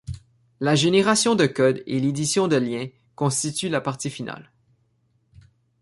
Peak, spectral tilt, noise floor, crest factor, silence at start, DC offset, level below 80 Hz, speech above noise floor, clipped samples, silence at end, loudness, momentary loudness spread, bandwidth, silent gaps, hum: -4 dBFS; -4.5 dB/octave; -66 dBFS; 20 dB; 0.1 s; under 0.1%; -54 dBFS; 45 dB; under 0.1%; 1.4 s; -22 LUFS; 17 LU; 11.5 kHz; none; none